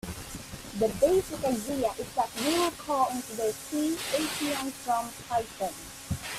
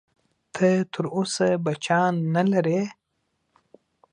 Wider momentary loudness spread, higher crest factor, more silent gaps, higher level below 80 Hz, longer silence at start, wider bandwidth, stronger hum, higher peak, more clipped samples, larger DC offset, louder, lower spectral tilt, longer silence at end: first, 11 LU vs 6 LU; about the same, 18 dB vs 18 dB; neither; first, -54 dBFS vs -70 dBFS; second, 0.05 s vs 0.55 s; first, 16 kHz vs 10.5 kHz; neither; second, -12 dBFS vs -6 dBFS; neither; neither; second, -30 LUFS vs -23 LUFS; second, -3.5 dB/octave vs -6 dB/octave; second, 0 s vs 1.2 s